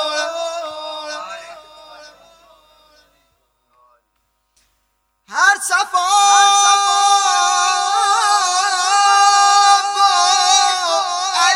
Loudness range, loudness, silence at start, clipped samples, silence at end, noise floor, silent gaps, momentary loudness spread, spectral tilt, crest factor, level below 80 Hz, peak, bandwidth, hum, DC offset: 17 LU; -13 LUFS; 0 s; under 0.1%; 0 s; -67 dBFS; none; 16 LU; 3.5 dB/octave; 16 dB; -66 dBFS; 0 dBFS; 15.5 kHz; none; under 0.1%